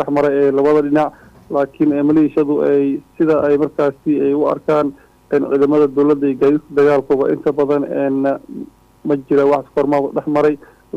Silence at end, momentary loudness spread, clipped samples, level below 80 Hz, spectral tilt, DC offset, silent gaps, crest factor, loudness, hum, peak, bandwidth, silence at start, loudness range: 0 s; 7 LU; under 0.1%; -54 dBFS; -8.5 dB/octave; under 0.1%; none; 10 dB; -16 LUFS; none; -6 dBFS; 6.8 kHz; 0 s; 2 LU